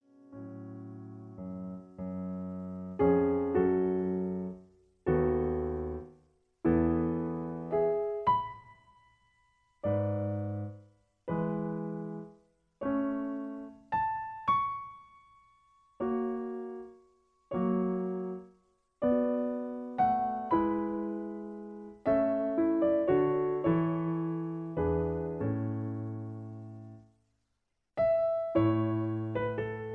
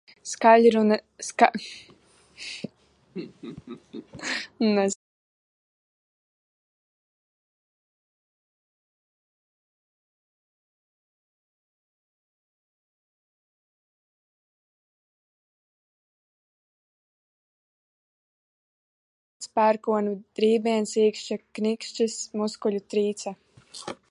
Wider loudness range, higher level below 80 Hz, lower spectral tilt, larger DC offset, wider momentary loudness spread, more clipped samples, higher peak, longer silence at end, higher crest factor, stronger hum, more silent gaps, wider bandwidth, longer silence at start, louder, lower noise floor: about the same, 6 LU vs 8 LU; first, -54 dBFS vs -74 dBFS; first, -10.5 dB/octave vs -4.5 dB/octave; neither; second, 17 LU vs 21 LU; neither; second, -16 dBFS vs -2 dBFS; second, 0 s vs 0.15 s; second, 18 dB vs 28 dB; neither; second, none vs 4.96-19.40 s; second, 4.8 kHz vs 11.5 kHz; about the same, 0.3 s vs 0.25 s; second, -32 LUFS vs -24 LUFS; first, -82 dBFS vs -56 dBFS